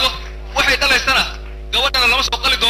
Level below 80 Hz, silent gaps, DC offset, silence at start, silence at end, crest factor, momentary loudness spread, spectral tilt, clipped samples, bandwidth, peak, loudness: -30 dBFS; none; under 0.1%; 0 s; 0 s; 12 dB; 11 LU; -1.5 dB/octave; under 0.1%; 16 kHz; -4 dBFS; -14 LUFS